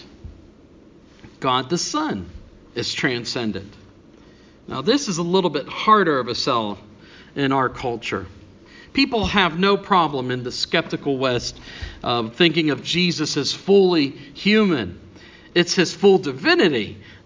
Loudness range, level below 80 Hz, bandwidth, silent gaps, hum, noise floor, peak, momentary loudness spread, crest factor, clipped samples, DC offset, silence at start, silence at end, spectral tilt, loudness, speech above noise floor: 6 LU; -46 dBFS; 7.6 kHz; none; none; -48 dBFS; 0 dBFS; 14 LU; 20 dB; under 0.1%; under 0.1%; 0 s; 0.1 s; -4.5 dB/octave; -20 LUFS; 28 dB